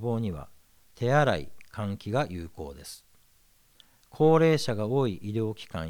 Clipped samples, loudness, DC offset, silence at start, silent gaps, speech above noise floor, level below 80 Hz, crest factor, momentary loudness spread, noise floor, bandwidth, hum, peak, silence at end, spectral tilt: under 0.1%; -27 LUFS; under 0.1%; 0 s; none; 36 dB; -56 dBFS; 20 dB; 20 LU; -63 dBFS; over 20 kHz; none; -10 dBFS; 0 s; -6.5 dB/octave